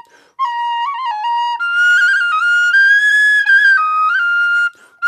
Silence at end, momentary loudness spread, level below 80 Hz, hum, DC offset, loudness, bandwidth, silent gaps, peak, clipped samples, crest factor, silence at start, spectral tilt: 0 s; 11 LU; -84 dBFS; none; under 0.1%; -12 LUFS; 12.5 kHz; none; -2 dBFS; under 0.1%; 10 dB; 0.4 s; 5 dB/octave